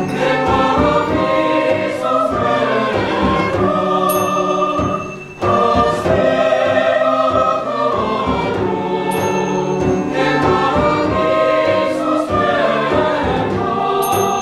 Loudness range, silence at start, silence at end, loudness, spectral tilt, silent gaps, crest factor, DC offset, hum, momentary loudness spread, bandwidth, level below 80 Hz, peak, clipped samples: 1 LU; 0 s; 0 s; -15 LUFS; -5.5 dB/octave; none; 14 dB; under 0.1%; none; 4 LU; 12.5 kHz; -38 dBFS; -2 dBFS; under 0.1%